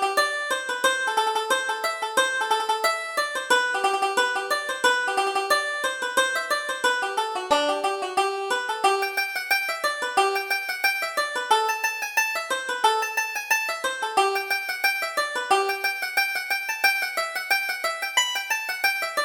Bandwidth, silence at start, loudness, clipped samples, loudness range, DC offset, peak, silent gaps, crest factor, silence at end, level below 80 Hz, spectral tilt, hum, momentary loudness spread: over 20 kHz; 0 s; -23 LUFS; under 0.1%; 1 LU; under 0.1%; -6 dBFS; none; 18 dB; 0 s; -68 dBFS; 1 dB/octave; none; 4 LU